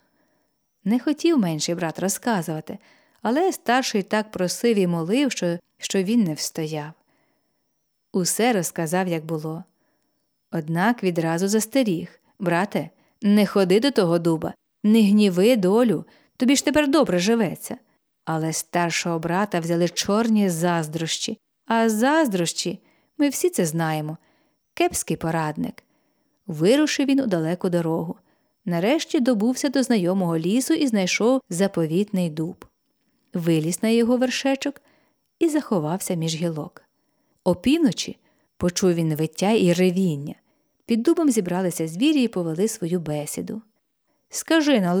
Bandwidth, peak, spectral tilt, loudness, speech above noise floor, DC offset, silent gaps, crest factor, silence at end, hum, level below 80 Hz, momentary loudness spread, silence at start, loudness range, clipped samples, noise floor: over 20 kHz; -6 dBFS; -5 dB/octave; -22 LUFS; 52 dB; under 0.1%; none; 16 dB; 0 s; none; -60 dBFS; 12 LU; 0.85 s; 5 LU; under 0.1%; -73 dBFS